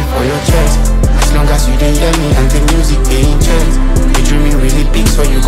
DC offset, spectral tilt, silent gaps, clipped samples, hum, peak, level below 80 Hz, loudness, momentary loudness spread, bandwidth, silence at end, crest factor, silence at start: under 0.1%; -5 dB/octave; none; under 0.1%; none; 0 dBFS; -10 dBFS; -12 LUFS; 2 LU; 15.5 kHz; 0 s; 8 dB; 0 s